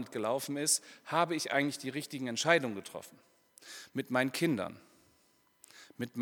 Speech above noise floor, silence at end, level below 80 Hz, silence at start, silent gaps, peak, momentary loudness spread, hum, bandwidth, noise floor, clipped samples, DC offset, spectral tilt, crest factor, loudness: 36 dB; 0 s; -84 dBFS; 0 s; none; -10 dBFS; 16 LU; none; 19 kHz; -70 dBFS; under 0.1%; under 0.1%; -3 dB/octave; 26 dB; -33 LUFS